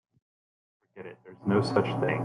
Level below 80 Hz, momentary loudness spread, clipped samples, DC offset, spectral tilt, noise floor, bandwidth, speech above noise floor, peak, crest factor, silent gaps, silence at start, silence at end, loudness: -66 dBFS; 21 LU; under 0.1%; under 0.1%; -7.5 dB/octave; under -90 dBFS; 11 kHz; over 62 dB; -10 dBFS; 20 dB; none; 0.95 s; 0 s; -27 LUFS